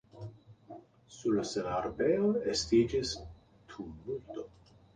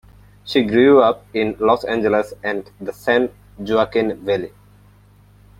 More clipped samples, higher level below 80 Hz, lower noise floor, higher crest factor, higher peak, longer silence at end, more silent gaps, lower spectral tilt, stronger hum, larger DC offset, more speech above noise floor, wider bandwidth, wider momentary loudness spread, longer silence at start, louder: neither; second, -56 dBFS vs -50 dBFS; first, -54 dBFS vs -49 dBFS; about the same, 18 dB vs 16 dB; second, -16 dBFS vs -2 dBFS; second, 0.5 s vs 1.1 s; neither; second, -5 dB/octave vs -6.5 dB/octave; second, none vs 50 Hz at -45 dBFS; neither; second, 22 dB vs 32 dB; second, 9.8 kHz vs 14.5 kHz; first, 24 LU vs 14 LU; second, 0.15 s vs 0.45 s; second, -32 LUFS vs -18 LUFS